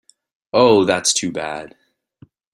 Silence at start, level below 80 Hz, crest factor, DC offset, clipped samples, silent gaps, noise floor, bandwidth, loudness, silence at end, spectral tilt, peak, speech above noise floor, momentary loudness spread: 0.55 s; -58 dBFS; 18 dB; under 0.1%; under 0.1%; none; -51 dBFS; 15 kHz; -16 LUFS; 0.85 s; -3 dB/octave; -2 dBFS; 34 dB; 14 LU